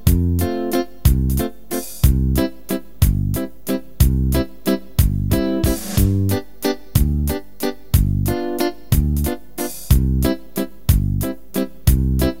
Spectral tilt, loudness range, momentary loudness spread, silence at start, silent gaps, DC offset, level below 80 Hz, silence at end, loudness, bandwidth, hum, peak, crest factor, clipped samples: -6 dB/octave; 1 LU; 8 LU; 0.05 s; none; 2%; -22 dBFS; 0.05 s; -20 LUFS; 16.5 kHz; none; 0 dBFS; 18 dB; under 0.1%